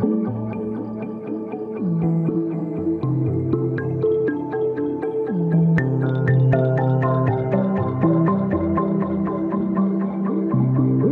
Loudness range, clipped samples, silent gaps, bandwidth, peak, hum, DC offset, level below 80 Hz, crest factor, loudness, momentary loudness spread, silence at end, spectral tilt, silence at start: 4 LU; under 0.1%; none; 4 kHz; -6 dBFS; none; under 0.1%; -52 dBFS; 14 dB; -21 LUFS; 9 LU; 0 s; -12 dB/octave; 0 s